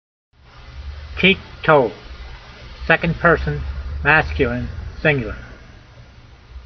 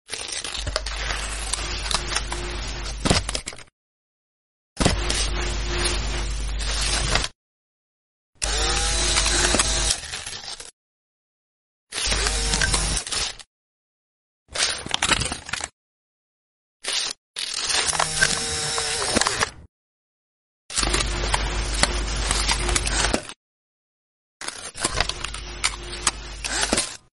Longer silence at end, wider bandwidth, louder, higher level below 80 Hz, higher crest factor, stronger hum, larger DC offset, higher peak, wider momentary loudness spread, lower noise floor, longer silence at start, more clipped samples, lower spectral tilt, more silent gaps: second, 0.05 s vs 0.2 s; second, 6.4 kHz vs 11.5 kHz; first, -18 LUFS vs -23 LUFS; about the same, -32 dBFS vs -32 dBFS; second, 20 dB vs 26 dB; neither; neither; about the same, 0 dBFS vs 0 dBFS; first, 22 LU vs 11 LU; second, -44 dBFS vs under -90 dBFS; first, 0.6 s vs 0.05 s; neither; first, -3.5 dB/octave vs -2 dB/octave; second, none vs 3.72-4.76 s, 7.35-8.33 s, 10.73-11.87 s, 13.47-14.46 s, 15.73-16.80 s, 17.17-17.34 s, 19.69-20.69 s, 23.36-24.40 s